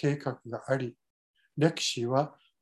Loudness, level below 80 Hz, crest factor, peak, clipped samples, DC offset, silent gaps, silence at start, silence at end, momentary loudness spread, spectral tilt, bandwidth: -31 LUFS; -74 dBFS; 22 dB; -10 dBFS; under 0.1%; under 0.1%; 1.10-1.34 s; 0 s; 0.3 s; 13 LU; -5 dB/octave; 12.5 kHz